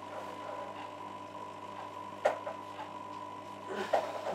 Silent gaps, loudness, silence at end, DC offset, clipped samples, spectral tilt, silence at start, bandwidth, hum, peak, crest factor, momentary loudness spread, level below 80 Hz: none; -39 LUFS; 0 s; under 0.1%; under 0.1%; -4.5 dB/octave; 0 s; 15.5 kHz; none; -14 dBFS; 24 dB; 11 LU; -84 dBFS